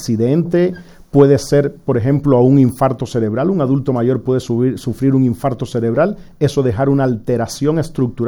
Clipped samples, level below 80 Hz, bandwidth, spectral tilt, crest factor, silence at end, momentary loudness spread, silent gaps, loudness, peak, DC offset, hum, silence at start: under 0.1%; -42 dBFS; 17 kHz; -8 dB/octave; 14 dB; 0 s; 8 LU; none; -15 LUFS; 0 dBFS; under 0.1%; none; 0 s